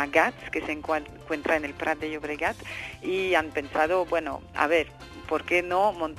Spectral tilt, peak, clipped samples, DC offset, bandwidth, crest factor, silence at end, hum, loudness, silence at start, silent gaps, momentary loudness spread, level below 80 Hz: -4.5 dB/octave; -6 dBFS; under 0.1%; under 0.1%; 14 kHz; 22 dB; 0 s; none; -27 LUFS; 0 s; none; 10 LU; -52 dBFS